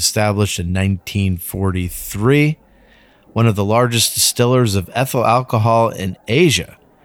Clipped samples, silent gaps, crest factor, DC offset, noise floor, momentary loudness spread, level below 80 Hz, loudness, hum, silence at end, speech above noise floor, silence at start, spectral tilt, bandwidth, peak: under 0.1%; none; 14 dB; under 0.1%; -49 dBFS; 7 LU; -42 dBFS; -16 LUFS; none; 0.4 s; 34 dB; 0 s; -4.5 dB/octave; 18 kHz; -2 dBFS